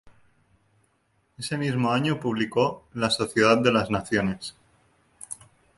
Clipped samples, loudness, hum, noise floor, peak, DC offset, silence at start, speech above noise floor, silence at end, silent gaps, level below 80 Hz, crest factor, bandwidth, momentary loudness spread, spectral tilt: under 0.1%; -24 LUFS; none; -69 dBFS; -4 dBFS; under 0.1%; 0.05 s; 45 dB; 0.45 s; none; -56 dBFS; 22 dB; 11.5 kHz; 19 LU; -5 dB/octave